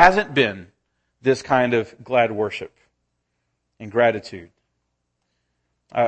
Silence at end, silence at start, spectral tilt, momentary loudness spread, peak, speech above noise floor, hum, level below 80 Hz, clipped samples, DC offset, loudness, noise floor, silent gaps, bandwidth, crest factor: 0 s; 0 s; -5.5 dB/octave; 20 LU; 0 dBFS; 54 dB; 60 Hz at -55 dBFS; -48 dBFS; under 0.1%; under 0.1%; -21 LUFS; -75 dBFS; none; 8.8 kHz; 22 dB